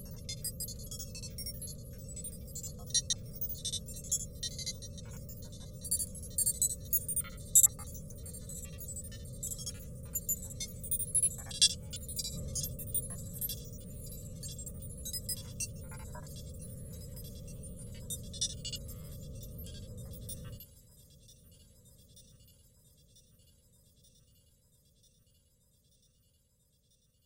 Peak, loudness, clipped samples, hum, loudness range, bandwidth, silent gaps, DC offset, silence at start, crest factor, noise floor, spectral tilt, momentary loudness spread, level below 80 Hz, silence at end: -10 dBFS; -35 LUFS; under 0.1%; none; 14 LU; 17 kHz; none; under 0.1%; 0 s; 30 dB; -72 dBFS; -2 dB/octave; 18 LU; -52 dBFS; 3.15 s